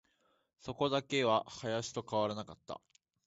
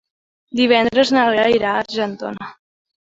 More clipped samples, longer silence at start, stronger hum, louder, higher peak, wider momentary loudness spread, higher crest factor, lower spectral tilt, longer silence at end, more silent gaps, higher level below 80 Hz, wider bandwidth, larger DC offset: neither; about the same, 0.65 s vs 0.55 s; neither; second, -35 LUFS vs -16 LUFS; second, -16 dBFS vs -2 dBFS; about the same, 17 LU vs 15 LU; about the same, 20 dB vs 18 dB; about the same, -3.5 dB/octave vs -4.5 dB/octave; second, 0.5 s vs 0.65 s; neither; second, -70 dBFS vs -56 dBFS; about the same, 8 kHz vs 7.8 kHz; neither